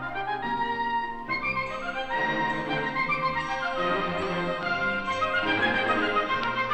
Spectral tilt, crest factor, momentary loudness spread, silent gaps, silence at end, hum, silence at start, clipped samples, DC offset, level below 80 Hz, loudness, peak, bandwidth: -5 dB/octave; 14 dB; 6 LU; none; 0 s; none; 0 s; under 0.1%; under 0.1%; -50 dBFS; -27 LUFS; -12 dBFS; 9.4 kHz